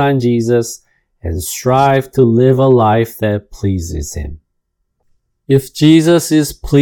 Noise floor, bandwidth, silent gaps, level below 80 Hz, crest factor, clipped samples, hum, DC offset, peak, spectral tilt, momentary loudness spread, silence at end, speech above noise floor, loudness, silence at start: -68 dBFS; 19 kHz; none; -36 dBFS; 14 dB; 0.2%; none; under 0.1%; 0 dBFS; -6.5 dB/octave; 14 LU; 0 s; 56 dB; -13 LUFS; 0 s